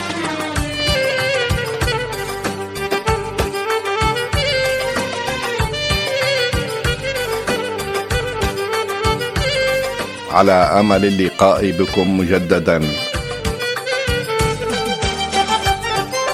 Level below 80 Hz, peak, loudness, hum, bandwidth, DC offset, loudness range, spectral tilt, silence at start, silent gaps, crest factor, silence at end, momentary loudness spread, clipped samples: -32 dBFS; 0 dBFS; -18 LUFS; none; 16 kHz; under 0.1%; 4 LU; -4.5 dB/octave; 0 s; none; 18 dB; 0 s; 8 LU; under 0.1%